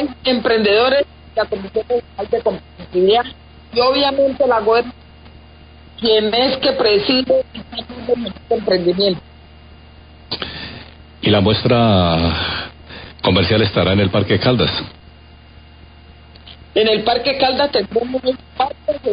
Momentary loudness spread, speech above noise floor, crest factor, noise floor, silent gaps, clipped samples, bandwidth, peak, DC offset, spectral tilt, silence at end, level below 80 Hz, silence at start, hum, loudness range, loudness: 13 LU; 26 dB; 16 dB; -42 dBFS; none; under 0.1%; 5.2 kHz; -2 dBFS; 0.1%; -11 dB/octave; 0 s; -38 dBFS; 0 s; none; 4 LU; -16 LUFS